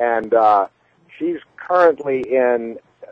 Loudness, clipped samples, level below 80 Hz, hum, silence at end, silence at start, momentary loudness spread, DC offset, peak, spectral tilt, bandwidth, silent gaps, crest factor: -17 LUFS; under 0.1%; -64 dBFS; none; 0 s; 0 s; 14 LU; under 0.1%; -2 dBFS; -7 dB/octave; 7.2 kHz; none; 16 dB